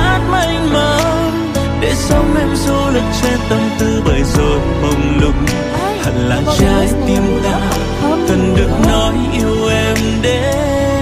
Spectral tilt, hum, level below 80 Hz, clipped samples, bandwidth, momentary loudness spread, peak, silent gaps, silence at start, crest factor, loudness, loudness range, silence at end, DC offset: -5.5 dB/octave; none; -20 dBFS; under 0.1%; 15.5 kHz; 4 LU; 0 dBFS; none; 0 s; 12 dB; -14 LUFS; 1 LU; 0 s; under 0.1%